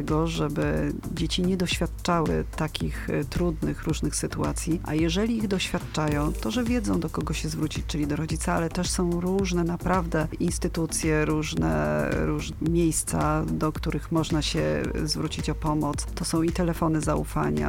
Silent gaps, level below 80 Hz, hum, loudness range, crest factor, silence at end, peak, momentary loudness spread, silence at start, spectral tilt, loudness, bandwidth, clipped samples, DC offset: none; -36 dBFS; none; 2 LU; 16 dB; 0 s; -10 dBFS; 4 LU; 0 s; -5 dB/octave; -26 LUFS; 17 kHz; under 0.1%; under 0.1%